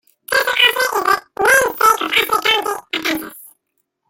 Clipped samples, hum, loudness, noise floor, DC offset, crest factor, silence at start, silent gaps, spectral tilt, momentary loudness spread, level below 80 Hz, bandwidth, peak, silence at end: under 0.1%; none; -15 LUFS; -71 dBFS; under 0.1%; 16 dB; 0.3 s; none; -0.5 dB/octave; 9 LU; -54 dBFS; 17 kHz; -2 dBFS; 0.6 s